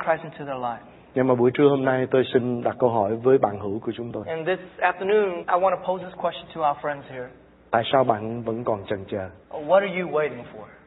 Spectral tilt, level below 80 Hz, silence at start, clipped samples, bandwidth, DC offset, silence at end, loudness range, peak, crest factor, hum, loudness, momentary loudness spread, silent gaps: -11 dB/octave; -62 dBFS; 0 s; under 0.1%; 4.1 kHz; under 0.1%; 0.1 s; 4 LU; -4 dBFS; 20 dB; none; -24 LUFS; 12 LU; none